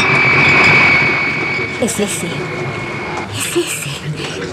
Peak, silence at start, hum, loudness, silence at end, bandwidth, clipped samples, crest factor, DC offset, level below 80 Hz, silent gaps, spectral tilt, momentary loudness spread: -2 dBFS; 0 s; none; -13 LUFS; 0 s; 15.5 kHz; under 0.1%; 14 dB; under 0.1%; -46 dBFS; none; -3.5 dB/octave; 15 LU